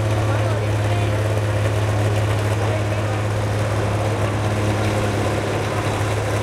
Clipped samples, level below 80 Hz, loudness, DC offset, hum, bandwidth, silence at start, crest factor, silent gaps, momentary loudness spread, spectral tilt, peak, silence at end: under 0.1%; -36 dBFS; -21 LUFS; under 0.1%; none; 13 kHz; 0 s; 12 dB; none; 2 LU; -6 dB/octave; -8 dBFS; 0 s